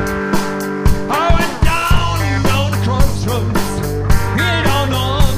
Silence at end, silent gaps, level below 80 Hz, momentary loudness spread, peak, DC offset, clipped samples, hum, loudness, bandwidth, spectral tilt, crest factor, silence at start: 0 s; none; -20 dBFS; 4 LU; 0 dBFS; under 0.1%; under 0.1%; none; -16 LUFS; 16 kHz; -5 dB/octave; 14 dB; 0 s